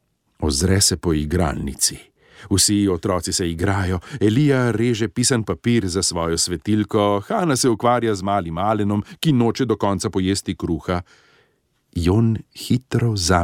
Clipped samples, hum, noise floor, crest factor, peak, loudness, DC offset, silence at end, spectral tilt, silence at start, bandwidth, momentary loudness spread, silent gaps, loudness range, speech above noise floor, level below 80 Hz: under 0.1%; none; -65 dBFS; 16 dB; -4 dBFS; -20 LUFS; under 0.1%; 0 s; -4.5 dB/octave; 0.4 s; 16.5 kHz; 7 LU; none; 3 LU; 46 dB; -38 dBFS